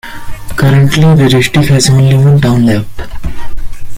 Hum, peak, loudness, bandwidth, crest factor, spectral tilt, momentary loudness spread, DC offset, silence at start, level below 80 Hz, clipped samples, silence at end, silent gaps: none; 0 dBFS; -8 LUFS; 16 kHz; 8 dB; -6 dB/octave; 20 LU; under 0.1%; 0.05 s; -24 dBFS; under 0.1%; 0 s; none